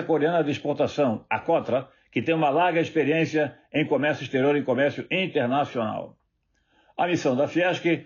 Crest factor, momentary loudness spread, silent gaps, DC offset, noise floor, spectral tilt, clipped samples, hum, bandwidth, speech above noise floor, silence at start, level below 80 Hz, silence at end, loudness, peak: 12 dB; 7 LU; none; under 0.1%; -71 dBFS; -4.5 dB/octave; under 0.1%; none; 7.2 kHz; 47 dB; 0 s; -70 dBFS; 0 s; -24 LUFS; -12 dBFS